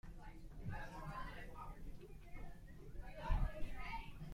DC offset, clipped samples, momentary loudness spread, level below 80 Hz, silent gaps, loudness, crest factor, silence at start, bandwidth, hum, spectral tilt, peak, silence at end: under 0.1%; under 0.1%; 14 LU; -48 dBFS; none; -51 LUFS; 20 dB; 0.05 s; 15 kHz; none; -6.5 dB/octave; -24 dBFS; 0 s